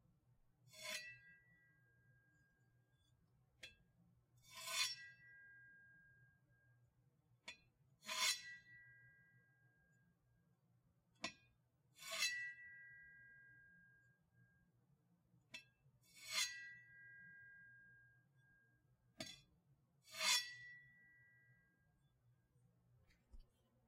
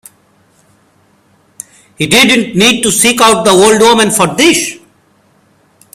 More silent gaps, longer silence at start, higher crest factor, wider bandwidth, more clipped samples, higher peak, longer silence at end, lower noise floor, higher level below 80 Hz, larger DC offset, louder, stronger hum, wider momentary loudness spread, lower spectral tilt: neither; second, 0.65 s vs 2 s; first, 28 dB vs 12 dB; second, 16 kHz vs over 20 kHz; second, under 0.1% vs 0.3%; second, -26 dBFS vs 0 dBFS; second, 0.45 s vs 1.2 s; first, -80 dBFS vs -50 dBFS; second, -82 dBFS vs -46 dBFS; neither; second, -44 LUFS vs -7 LUFS; neither; first, 25 LU vs 21 LU; second, 1 dB/octave vs -2.5 dB/octave